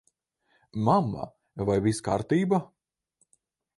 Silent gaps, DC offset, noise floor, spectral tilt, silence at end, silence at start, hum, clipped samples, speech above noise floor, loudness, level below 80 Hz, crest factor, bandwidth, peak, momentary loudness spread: none; under 0.1%; -73 dBFS; -7 dB/octave; 1.15 s; 0.75 s; none; under 0.1%; 47 dB; -27 LUFS; -56 dBFS; 20 dB; 11.5 kHz; -8 dBFS; 13 LU